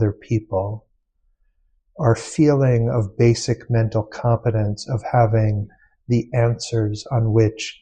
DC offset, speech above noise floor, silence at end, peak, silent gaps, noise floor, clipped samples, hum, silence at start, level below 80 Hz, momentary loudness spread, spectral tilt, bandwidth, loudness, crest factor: under 0.1%; 46 dB; 0.1 s; -4 dBFS; none; -65 dBFS; under 0.1%; none; 0 s; -44 dBFS; 8 LU; -7 dB/octave; 9.4 kHz; -20 LUFS; 16 dB